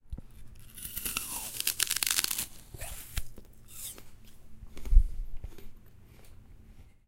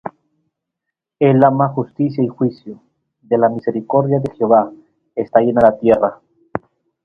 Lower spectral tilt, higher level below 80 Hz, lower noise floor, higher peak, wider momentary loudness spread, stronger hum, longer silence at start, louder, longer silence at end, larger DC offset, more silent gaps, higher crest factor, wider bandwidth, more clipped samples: second, -1 dB/octave vs -10.5 dB/octave; first, -34 dBFS vs -54 dBFS; second, -53 dBFS vs -80 dBFS; second, -6 dBFS vs 0 dBFS; first, 22 LU vs 17 LU; neither; about the same, 0.05 s vs 0.05 s; second, -32 LUFS vs -16 LUFS; second, 0.15 s vs 0.45 s; neither; neither; first, 26 dB vs 16 dB; first, 17 kHz vs 5.6 kHz; neither